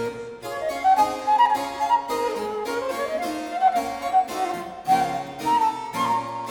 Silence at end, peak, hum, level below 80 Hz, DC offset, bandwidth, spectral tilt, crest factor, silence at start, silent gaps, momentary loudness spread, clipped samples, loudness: 0 s; -8 dBFS; none; -58 dBFS; under 0.1%; 19.5 kHz; -3.5 dB/octave; 16 dB; 0 s; none; 9 LU; under 0.1%; -23 LUFS